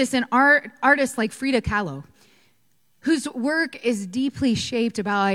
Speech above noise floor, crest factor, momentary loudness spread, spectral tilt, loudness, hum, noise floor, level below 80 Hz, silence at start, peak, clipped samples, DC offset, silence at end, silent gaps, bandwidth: 46 dB; 18 dB; 9 LU; -4.5 dB/octave; -22 LUFS; none; -68 dBFS; -48 dBFS; 0 s; -4 dBFS; under 0.1%; under 0.1%; 0 s; none; 15.5 kHz